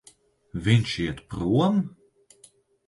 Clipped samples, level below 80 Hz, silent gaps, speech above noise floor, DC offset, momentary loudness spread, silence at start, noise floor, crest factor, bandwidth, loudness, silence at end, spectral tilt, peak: under 0.1%; -48 dBFS; none; 35 dB; under 0.1%; 11 LU; 0.55 s; -58 dBFS; 20 dB; 11.5 kHz; -25 LUFS; 1 s; -6.5 dB/octave; -6 dBFS